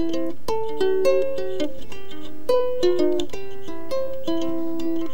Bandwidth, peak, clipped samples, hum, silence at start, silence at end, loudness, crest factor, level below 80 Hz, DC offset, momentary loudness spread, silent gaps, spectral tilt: 17 kHz; -8 dBFS; under 0.1%; none; 0 s; 0 s; -25 LUFS; 16 dB; -48 dBFS; 9%; 15 LU; none; -5.5 dB/octave